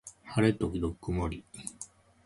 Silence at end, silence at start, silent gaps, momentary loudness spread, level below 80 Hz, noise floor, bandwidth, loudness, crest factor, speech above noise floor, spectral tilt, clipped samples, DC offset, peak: 0.4 s; 0.05 s; none; 16 LU; -46 dBFS; -51 dBFS; 11.5 kHz; -32 LUFS; 20 dB; 21 dB; -6 dB/octave; under 0.1%; under 0.1%; -12 dBFS